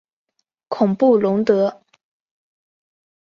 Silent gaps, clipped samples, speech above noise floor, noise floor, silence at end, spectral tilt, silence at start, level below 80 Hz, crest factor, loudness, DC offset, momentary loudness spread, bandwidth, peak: none; under 0.1%; 24 dB; -40 dBFS; 1.55 s; -8.5 dB/octave; 0.7 s; -66 dBFS; 18 dB; -17 LUFS; under 0.1%; 8 LU; 7.2 kHz; -2 dBFS